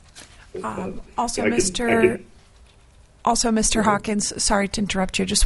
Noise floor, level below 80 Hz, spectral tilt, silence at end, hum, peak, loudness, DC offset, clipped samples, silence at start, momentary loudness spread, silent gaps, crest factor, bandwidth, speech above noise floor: -51 dBFS; -38 dBFS; -3 dB/octave; 0 s; none; -4 dBFS; -21 LUFS; under 0.1%; under 0.1%; 0.15 s; 12 LU; none; 18 dB; 11.5 kHz; 30 dB